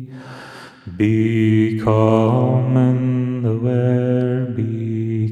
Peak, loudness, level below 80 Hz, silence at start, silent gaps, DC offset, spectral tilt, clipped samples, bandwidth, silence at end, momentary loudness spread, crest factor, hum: -2 dBFS; -17 LUFS; -52 dBFS; 0 s; none; under 0.1%; -9.5 dB/octave; under 0.1%; 7.4 kHz; 0 s; 20 LU; 16 dB; none